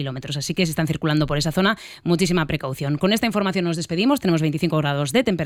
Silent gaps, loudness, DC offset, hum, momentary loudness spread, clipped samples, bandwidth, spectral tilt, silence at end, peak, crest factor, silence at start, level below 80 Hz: none; -21 LUFS; under 0.1%; none; 6 LU; under 0.1%; 16 kHz; -5.5 dB/octave; 0 s; -6 dBFS; 16 dB; 0 s; -46 dBFS